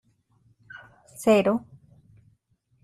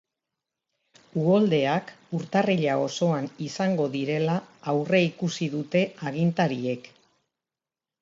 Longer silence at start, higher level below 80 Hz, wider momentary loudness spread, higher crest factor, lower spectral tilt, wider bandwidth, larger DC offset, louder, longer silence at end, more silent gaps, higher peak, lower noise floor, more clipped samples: second, 0.75 s vs 1.15 s; first, -64 dBFS vs -72 dBFS; first, 26 LU vs 8 LU; about the same, 20 dB vs 18 dB; about the same, -5.5 dB/octave vs -6.5 dB/octave; first, 14 kHz vs 7.8 kHz; neither; first, -23 LUFS vs -26 LUFS; about the same, 1.25 s vs 1.15 s; neither; about the same, -8 dBFS vs -8 dBFS; second, -68 dBFS vs under -90 dBFS; neither